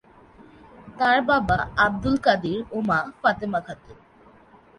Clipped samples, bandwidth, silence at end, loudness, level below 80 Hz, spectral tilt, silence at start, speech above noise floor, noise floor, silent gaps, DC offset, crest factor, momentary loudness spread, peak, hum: under 0.1%; 11 kHz; 0.85 s; -22 LUFS; -46 dBFS; -6.5 dB/octave; 0.4 s; 30 dB; -52 dBFS; none; under 0.1%; 20 dB; 9 LU; -6 dBFS; none